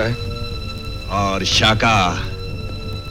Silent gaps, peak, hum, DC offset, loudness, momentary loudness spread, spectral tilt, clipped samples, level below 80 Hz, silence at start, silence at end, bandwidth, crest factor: none; -4 dBFS; none; under 0.1%; -19 LUFS; 15 LU; -4 dB/octave; under 0.1%; -30 dBFS; 0 s; 0 s; 16 kHz; 16 dB